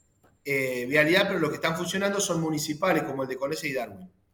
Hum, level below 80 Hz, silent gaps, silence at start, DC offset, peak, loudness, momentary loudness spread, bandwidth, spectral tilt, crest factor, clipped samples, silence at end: none; -64 dBFS; none; 0.45 s; under 0.1%; -8 dBFS; -26 LUFS; 10 LU; 19 kHz; -4 dB/octave; 18 dB; under 0.1%; 0.25 s